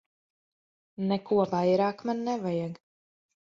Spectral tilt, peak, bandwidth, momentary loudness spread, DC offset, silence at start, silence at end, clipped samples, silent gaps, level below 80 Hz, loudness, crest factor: -7.5 dB/octave; -12 dBFS; 7.4 kHz; 9 LU; under 0.1%; 1 s; 0.75 s; under 0.1%; none; -72 dBFS; -28 LUFS; 18 dB